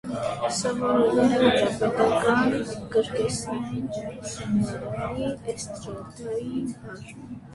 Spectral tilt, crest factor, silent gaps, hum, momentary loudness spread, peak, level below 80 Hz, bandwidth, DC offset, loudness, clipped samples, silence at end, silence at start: -5 dB/octave; 18 dB; none; none; 16 LU; -6 dBFS; -52 dBFS; 11.5 kHz; under 0.1%; -25 LUFS; under 0.1%; 0 s; 0.05 s